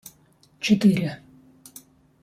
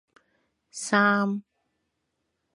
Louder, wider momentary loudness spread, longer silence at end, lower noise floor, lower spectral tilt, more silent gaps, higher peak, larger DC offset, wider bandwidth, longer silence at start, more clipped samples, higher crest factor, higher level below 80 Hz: about the same, -22 LUFS vs -24 LUFS; first, 26 LU vs 16 LU; about the same, 1.05 s vs 1.15 s; second, -58 dBFS vs -79 dBFS; first, -6 dB/octave vs -4.5 dB/octave; neither; about the same, -6 dBFS vs -6 dBFS; neither; first, 15 kHz vs 11.5 kHz; second, 0.6 s vs 0.75 s; neither; about the same, 18 dB vs 22 dB; first, -64 dBFS vs -80 dBFS